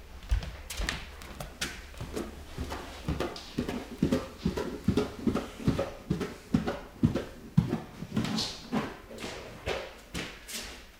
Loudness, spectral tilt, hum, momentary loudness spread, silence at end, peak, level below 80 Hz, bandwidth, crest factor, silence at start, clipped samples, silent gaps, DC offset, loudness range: -34 LUFS; -5.5 dB/octave; none; 10 LU; 0 s; -10 dBFS; -44 dBFS; 17.5 kHz; 24 dB; 0 s; under 0.1%; none; under 0.1%; 5 LU